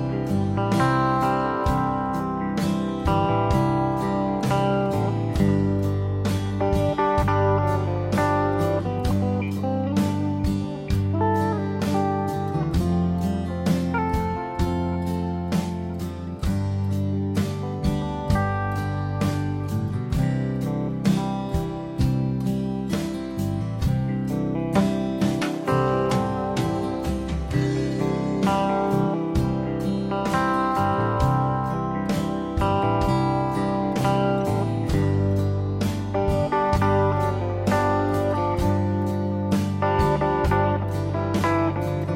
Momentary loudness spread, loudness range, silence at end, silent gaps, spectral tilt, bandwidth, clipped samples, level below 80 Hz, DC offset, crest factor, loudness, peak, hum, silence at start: 5 LU; 3 LU; 0 s; none; -7.5 dB/octave; 16 kHz; under 0.1%; -36 dBFS; under 0.1%; 16 dB; -24 LUFS; -6 dBFS; none; 0 s